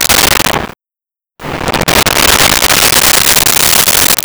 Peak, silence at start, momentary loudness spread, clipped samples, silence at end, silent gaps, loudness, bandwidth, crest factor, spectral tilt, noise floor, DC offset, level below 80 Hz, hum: 0 dBFS; 0 s; 13 LU; 0.1%; 0.05 s; none; -6 LUFS; over 20 kHz; 10 dB; -1 dB/octave; -89 dBFS; under 0.1%; -28 dBFS; none